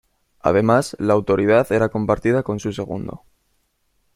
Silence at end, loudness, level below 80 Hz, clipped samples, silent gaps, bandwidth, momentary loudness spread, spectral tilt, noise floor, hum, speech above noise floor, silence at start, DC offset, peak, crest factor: 1 s; -19 LUFS; -48 dBFS; under 0.1%; none; 16 kHz; 11 LU; -7 dB/octave; -67 dBFS; none; 48 dB; 0.45 s; under 0.1%; -2 dBFS; 18 dB